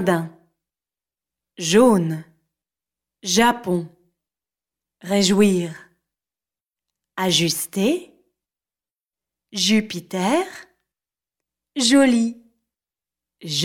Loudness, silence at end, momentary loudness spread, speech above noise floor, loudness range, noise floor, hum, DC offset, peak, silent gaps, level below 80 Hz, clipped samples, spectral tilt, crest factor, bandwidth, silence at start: -19 LUFS; 0 s; 17 LU; over 71 dB; 4 LU; under -90 dBFS; none; under 0.1%; -4 dBFS; none; -62 dBFS; under 0.1%; -4 dB/octave; 20 dB; 17 kHz; 0 s